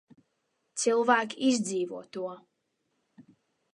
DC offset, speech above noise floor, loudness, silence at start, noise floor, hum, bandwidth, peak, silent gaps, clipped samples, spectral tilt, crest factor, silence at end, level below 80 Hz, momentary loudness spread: under 0.1%; 50 dB; -28 LUFS; 0.75 s; -78 dBFS; none; 11.5 kHz; -8 dBFS; none; under 0.1%; -3 dB/octave; 22 dB; 0.5 s; -84 dBFS; 15 LU